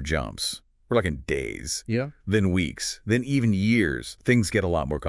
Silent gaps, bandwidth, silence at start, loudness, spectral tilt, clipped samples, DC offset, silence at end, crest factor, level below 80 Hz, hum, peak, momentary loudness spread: none; 12 kHz; 0 s; -25 LUFS; -5 dB/octave; under 0.1%; under 0.1%; 0 s; 18 dB; -44 dBFS; none; -8 dBFS; 8 LU